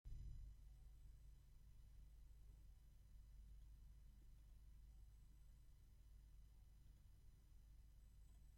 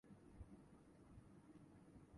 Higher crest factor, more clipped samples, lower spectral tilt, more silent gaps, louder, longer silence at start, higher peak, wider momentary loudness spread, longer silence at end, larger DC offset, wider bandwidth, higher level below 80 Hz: about the same, 16 dB vs 18 dB; neither; second, -6 dB/octave vs -7.5 dB/octave; neither; about the same, -67 LUFS vs -66 LUFS; about the same, 0.05 s vs 0.05 s; about the same, -46 dBFS vs -46 dBFS; first, 8 LU vs 3 LU; about the same, 0 s vs 0 s; neither; first, 16 kHz vs 11 kHz; first, -64 dBFS vs -72 dBFS